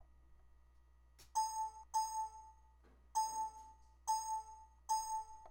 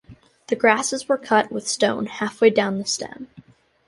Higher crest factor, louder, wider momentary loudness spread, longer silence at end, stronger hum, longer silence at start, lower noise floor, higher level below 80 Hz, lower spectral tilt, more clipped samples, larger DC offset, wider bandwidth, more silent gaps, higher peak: about the same, 16 dB vs 20 dB; second, -42 LUFS vs -21 LUFS; first, 18 LU vs 11 LU; second, 0 s vs 0.45 s; neither; about the same, 0 s vs 0.1 s; first, -66 dBFS vs -49 dBFS; about the same, -66 dBFS vs -62 dBFS; second, 0 dB/octave vs -3 dB/octave; neither; neither; first, 16.5 kHz vs 11.5 kHz; neither; second, -28 dBFS vs -2 dBFS